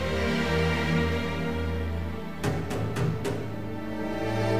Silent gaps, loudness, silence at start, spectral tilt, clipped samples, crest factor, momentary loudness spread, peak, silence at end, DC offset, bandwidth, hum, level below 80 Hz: none; -29 LUFS; 0 s; -6.5 dB/octave; under 0.1%; 14 dB; 8 LU; -14 dBFS; 0 s; 1%; 15.5 kHz; none; -40 dBFS